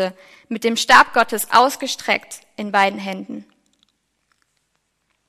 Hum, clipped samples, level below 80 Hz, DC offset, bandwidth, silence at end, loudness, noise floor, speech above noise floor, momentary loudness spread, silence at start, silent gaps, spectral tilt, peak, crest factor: none; under 0.1%; -62 dBFS; under 0.1%; 16 kHz; 1.85 s; -17 LUFS; -70 dBFS; 52 dB; 19 LU; 0 s; none; -2 dB/octave; 0 dBFS; 20 dB